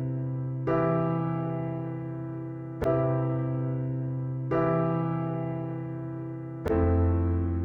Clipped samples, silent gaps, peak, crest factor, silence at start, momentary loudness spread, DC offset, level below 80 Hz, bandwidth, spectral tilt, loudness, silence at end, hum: under 0.1%; none; -14 dBFS; 14 dB; 0 s; 10 LU; under 0.1%; -44 dBFS; 4.3 kHz; -11 dB/octave; -29 LUFS; 0 s; none